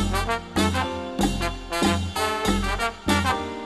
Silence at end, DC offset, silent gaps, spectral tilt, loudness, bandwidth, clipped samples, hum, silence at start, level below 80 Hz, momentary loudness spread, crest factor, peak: 0 s; 0.2%; none; -4.5 dB/octave; -24 LUFS; 13 kHz; under 0.1%; none; 0 s; -34 dBFS; 4 LU; 18 dB; -6 dBFS